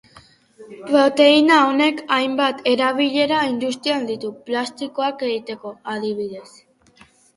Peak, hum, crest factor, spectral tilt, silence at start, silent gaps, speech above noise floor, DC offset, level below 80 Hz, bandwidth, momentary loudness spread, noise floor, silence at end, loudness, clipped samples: -2 dBFS; none; 18 dB; -4 dB/octave; 0.6 s; none; 34 dB; under 0.1%; -66 dBFS; 11.5 kHz; 16 LU; -52 dBFS; 0.95 s; -19 LUFS; under 0.1%